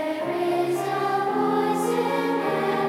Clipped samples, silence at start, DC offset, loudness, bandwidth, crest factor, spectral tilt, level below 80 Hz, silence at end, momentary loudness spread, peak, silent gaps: under 0.1%; 0 s; under 0.1%; -24 LUFS; 16 kHz; 12 dB; -5.5 dB/octave; -72 dBFS; 0 s; 2 LU; -12 dBFS; none